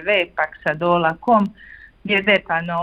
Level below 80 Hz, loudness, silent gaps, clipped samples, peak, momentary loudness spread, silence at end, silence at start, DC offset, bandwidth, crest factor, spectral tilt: -54 dBFS; -19 LUFS; none; under 0.1%; -4 dBFS; 7 LU; 0 s; 0 s; under 0.1%; 7.8 kHz; 16 dB; -7 dB/octave